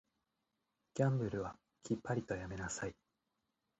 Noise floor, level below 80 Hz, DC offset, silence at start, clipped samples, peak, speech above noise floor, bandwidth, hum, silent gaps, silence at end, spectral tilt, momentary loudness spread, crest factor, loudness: -87 dBFS; -64 dBFS; under 0.1%; 0.95 s; under 0.1%; -20 dBFS; 48 dB; 8.4 kHz; none; none; 0.85 s; -6.5 dB/octave; 12 LU; 22 dB; -40 LUFS